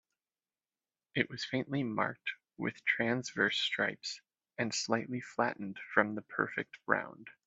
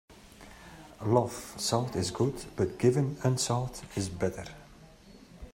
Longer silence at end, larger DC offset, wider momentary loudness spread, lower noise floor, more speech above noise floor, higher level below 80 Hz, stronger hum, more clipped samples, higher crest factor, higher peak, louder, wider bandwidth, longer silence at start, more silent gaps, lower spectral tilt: about the same, 0.15 s vs 0.05 s; neither; second, 10 LU vs 23 LU; first, under -90 dBFS vs -53 dBFS; first, over 55 dB vs 24 dB; second, -78 dBFS vs -56 dBFS; neither; neither; about the same, 26 dB vs 22 dB; about the same, -10 dBFS vs -10 dBFS; second, -34 LUFS vs -30 LUFS; second, 8.4 kHz vs 16 kHz; first, 1.15 s vs 0.1 s; neither; second, -4 dB/octave vs -5.5 dB/octave